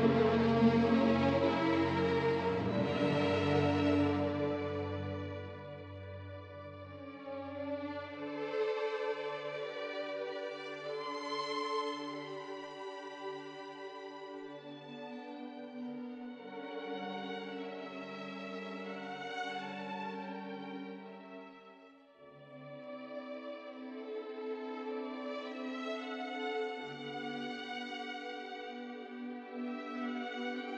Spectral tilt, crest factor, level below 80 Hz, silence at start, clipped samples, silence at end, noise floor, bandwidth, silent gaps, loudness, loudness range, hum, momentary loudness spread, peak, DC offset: -7 dB/octave; 20 dB; -70 dBFS; 0 s; under 0.1%; 0 s; -59 dBFS; 9 kHz; none; -37 LUFS; 14 LU; none; 17 LU; -16 dBFS; under 0.1%